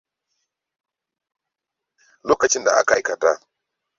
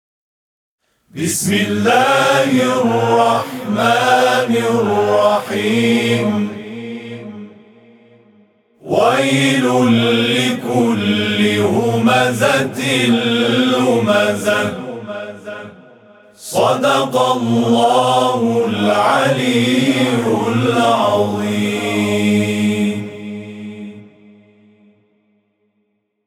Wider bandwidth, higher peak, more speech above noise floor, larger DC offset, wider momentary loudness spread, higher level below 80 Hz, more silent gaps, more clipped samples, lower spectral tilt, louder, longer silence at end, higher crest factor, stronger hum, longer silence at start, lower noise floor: second, 7.8 kHz vs 18 kHz; about the same, -2 dBFS vs 0 dBFS; first, 66 dB vs 52 dB; neither; second, 9 LU vs 15 LU; first, -60 dBFS vs -66 dBFS; neither; neither; second, -1.5 dB/octave vs -4.5 dB/octave; second, -19 LUFS vs -15 LUFS; second, 0.6 s vs 2.2 s; first, 22 dB vs 16 dB; neither; first, 2.25 s vs 1.15 s; first, -84 dBFS vs -66 dBFS